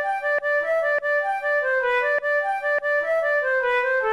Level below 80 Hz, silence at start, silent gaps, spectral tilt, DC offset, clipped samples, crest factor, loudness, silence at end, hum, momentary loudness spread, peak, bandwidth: -60 dBFS; 0 s; none; -1.5 dB/octave; under 0.1%; under 0.1%; 10 dB; -22 LUFS; 0 s; none; 2 LU; -12 dBFS; 12 kHz